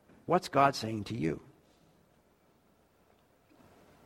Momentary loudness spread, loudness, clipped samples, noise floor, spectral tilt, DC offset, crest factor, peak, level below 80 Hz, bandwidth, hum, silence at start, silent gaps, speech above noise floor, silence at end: 10 LU; -31 LUFS; under 0.1%; -68 dBFS; -5.5 dB/octave; under 0.1%; 24 dB; -10 dBFS; -66 dBFS; 16 kHz; none; 0.3 s; none; 37 dB; 2.7 s